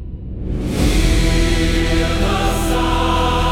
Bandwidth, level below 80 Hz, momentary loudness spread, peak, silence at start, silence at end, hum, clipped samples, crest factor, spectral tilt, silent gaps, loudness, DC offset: 16.5 kHz; -20 dBFS; 8 LU; -4 dBFS; 0 s; 0 s; none; under 0.1%; 12 dB; -5 dB/octave; none; -17 LUFS; under 0.1%